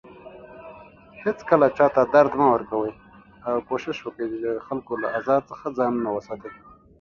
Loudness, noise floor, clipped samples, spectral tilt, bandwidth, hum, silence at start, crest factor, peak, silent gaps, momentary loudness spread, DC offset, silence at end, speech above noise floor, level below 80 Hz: -23 LUFS; -46 dBFS; under 0.1%; -7.5 dB/octave; 7 kHz; none; 0.05 s; 22 dB; -2 dBFS; none; 24 LU; under 0.1%; 0.45 s; 24 dB; -58 dBFS